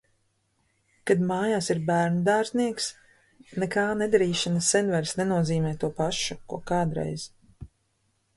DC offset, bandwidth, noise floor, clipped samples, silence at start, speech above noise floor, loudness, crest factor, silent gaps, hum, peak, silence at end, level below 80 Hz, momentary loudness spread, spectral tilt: under 0.1%; 11.5 kHz; -72 dBFS; under 0.1%; 1.05 s; 46 dB; -26 LUFS; 18 dB; none; none; -8 dBFS; 0.7 s; -56 dBFS; 9 LU; -4.5 dB/octave